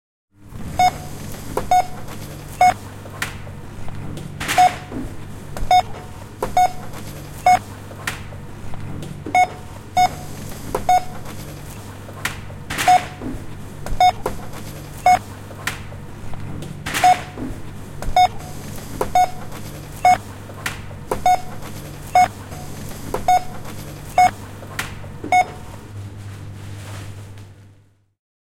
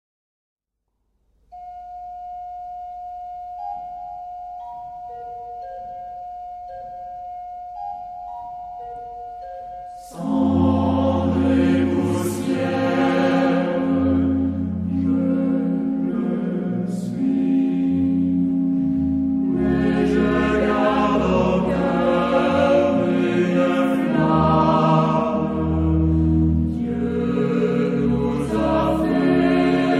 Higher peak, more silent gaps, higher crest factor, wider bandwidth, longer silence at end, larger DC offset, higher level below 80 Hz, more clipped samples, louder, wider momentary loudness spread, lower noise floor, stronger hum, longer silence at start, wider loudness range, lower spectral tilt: about the same, -4 dBFS vs -4 dBFS; neither; about the same, 18 dB vs 16 dB; first, 17 kHz vs 12.5 kHz; first, 0.8 s vs 0 s; neither; about the same, -38 dBFS vs -38 dBFS; neither; about the same, -20 LUFS vs -20 LUFS; about the same, 18 LU vs 17 LU; second, -53 dBFS vs -75 dBFS; neither; second, 0.4 s vs 1.5 s; second, 2 LU vs 15 LU; second, -4 dB/octave vs -8 dB/octave